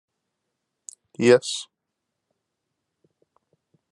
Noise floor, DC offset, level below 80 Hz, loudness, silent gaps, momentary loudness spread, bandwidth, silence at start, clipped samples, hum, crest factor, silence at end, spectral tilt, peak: -82 dBFS; under 0.1%; -76 dBFS; -21 LUFS; none; 26 LU; 11.5 kHz; 1.2 s; under 0.1%; none; 24 dB; 2.3 s; -4.5 dB/octave; -4 dBFS